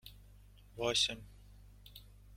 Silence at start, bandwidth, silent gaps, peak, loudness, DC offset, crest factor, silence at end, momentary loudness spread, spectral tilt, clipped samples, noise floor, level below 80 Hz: 0.05 s; 16.5 kHz; none; -18 dBFS; -34 LUFS; under 0.1%; 24 dB; 0 s; 25 LU; -2 dB/octave; under 0.1%; -59 dBFS; -58 dBFS